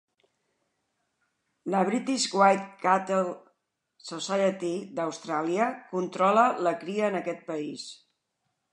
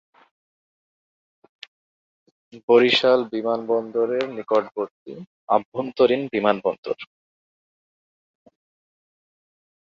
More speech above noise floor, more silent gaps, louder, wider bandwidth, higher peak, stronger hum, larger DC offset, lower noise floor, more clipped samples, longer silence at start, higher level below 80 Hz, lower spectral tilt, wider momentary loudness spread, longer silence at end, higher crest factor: second, 53 dB vs over 69 dB; second, none vs 2.63-2.68 s, 4.91-5.06 s, 5.27-5.47 s, 5.65-5.72 s, 6.78-6.83 s; second, -27 LUFS vs -21 LUFS; first, 11 kHz vs 7.6 kHz; second, -8 dBFS vs -2 dBFS; neither; neither; second, -79 dBFS vs under -90 dBFS; neither; second, 1.65 s vs 2.55 s; second, -84 dBFS vs -70 dBFS; about the same, -4.5 dB/octave vs -5.5 dB/octave; about the same, 15 LU vs 17 LU; second, 0.8 s vs 2.85 s; about the same, 22 dB vs 22 dB